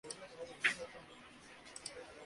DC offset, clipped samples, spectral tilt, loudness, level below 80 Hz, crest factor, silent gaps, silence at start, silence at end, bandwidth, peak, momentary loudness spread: under 0.1%; under 0.1%; -1 dB/octave; -41 LUFS; -74 dBFS; 28 dB; none; 0.05 s; 0 s; 11.5 kHz; -18 dBFS; 20 LU